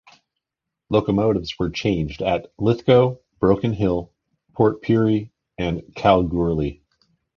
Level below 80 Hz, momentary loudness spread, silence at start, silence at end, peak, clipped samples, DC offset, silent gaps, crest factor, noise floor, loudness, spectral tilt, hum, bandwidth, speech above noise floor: -42 dBFS; 9 LU; 0.9 s; 0.65 s; -2 dBFS; under 0.1%; under 0.1%; none; 20 dB; -84 dBFS; -21 LUFS; -8 dB/octave; none; 7 kHz; 65 dB